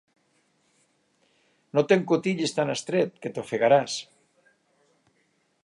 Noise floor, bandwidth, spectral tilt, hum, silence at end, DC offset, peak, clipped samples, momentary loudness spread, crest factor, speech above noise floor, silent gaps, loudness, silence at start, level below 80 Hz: -70 dBFS; 11.5 kHz; -5 dB/octave; none; 1.6 s; under 0.1%; -6 dBFS; under 0.1%; 11 LU; 22 dB; 46 dB; none; -25 LUFS; 1.75 s; -76 dBFS